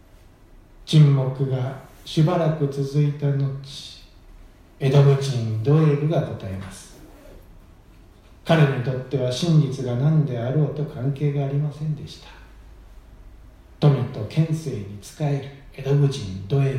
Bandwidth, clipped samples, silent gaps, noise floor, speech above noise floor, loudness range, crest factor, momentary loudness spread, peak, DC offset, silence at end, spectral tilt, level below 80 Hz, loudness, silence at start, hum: 10.5 kHz; under 0.1%; none; -49 dBFS; 28 dB; 5 LU; 18 dB; 16 LU; -4 dBFS; under 0.1%; 0 s; -7.5 dB/octave; -50 dBFS; -22 LUFS; 0.8 s; none